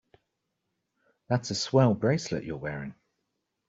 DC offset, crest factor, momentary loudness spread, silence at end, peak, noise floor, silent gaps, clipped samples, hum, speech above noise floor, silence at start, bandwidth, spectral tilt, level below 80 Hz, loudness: under 0.1%; 22 dB; 13 LU; 0.75 s; -8 dBFS; -81 dBFS; none; under 0.1%; none; 54 dB; 1.3 s; 7.8 kHz; -6 dB/octave; -62 dBFS; -28 LUFS